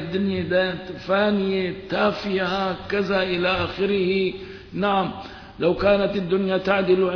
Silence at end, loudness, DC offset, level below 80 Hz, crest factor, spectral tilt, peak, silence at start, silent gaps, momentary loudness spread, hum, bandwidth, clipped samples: 0 s; -22 LUFS; under 0.1%; -48 dBFS; 16 dB; -7.5 dB/octave; -8 dBFS; 0 s; none; 7 LU; none; 5.4 kHz; under 0.1%